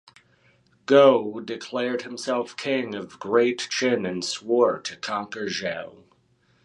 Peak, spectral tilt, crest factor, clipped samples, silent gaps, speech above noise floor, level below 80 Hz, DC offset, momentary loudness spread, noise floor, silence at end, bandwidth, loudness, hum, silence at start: -2 dBFS; -4 dB/octave; 22 dB; under 0.1%; none; 40 dB; -70 dBFS; under 0.1%; 15 LU; -64 dBFS; 0.75 s; 11.5 kHz; -24 LUFS; none; 0.9 s